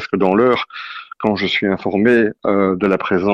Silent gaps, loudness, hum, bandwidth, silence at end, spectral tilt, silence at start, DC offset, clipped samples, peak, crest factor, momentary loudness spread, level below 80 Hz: none; -16 LUFS; none; 7.4 kHz; 0 s; -7.5 dB/octave; 0 s; under 0.1%; under 0.1%; -2 dBFS; 14 dB; 9 LU; -52 dBFS